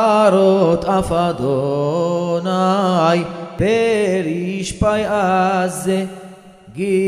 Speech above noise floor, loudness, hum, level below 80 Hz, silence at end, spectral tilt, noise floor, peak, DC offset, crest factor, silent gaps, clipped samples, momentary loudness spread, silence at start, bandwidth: 23 dB; -17 LUFS; none; -40 dBFS; 0 s; -6 dB/octave; -39 dBFS; 0 dBFS; under 0.1%; 16 dB; none; under 0.1%; 9 LU; 0 s; 15 kHz